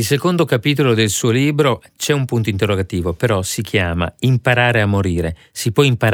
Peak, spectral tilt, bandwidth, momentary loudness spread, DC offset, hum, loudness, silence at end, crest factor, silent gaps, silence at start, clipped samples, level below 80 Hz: 0 dBFS; -5 dB/octave; 18.5 kHz; 6 LU; under 0.1%; none; -17 LUFS; 0 s; 16 dB; none; 0 s; under 0.1%; -40 dBFS